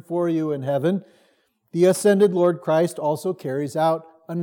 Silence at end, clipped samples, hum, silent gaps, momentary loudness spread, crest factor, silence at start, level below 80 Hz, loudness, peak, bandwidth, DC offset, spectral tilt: 0 s; under 0.1%; none; none; 10 LU; 16 dB; 0.1 s; -82 dBFS; -21 LUFS; -6 dBFS; 18.5 kHz; under 0.1%; -6.5 dB/octave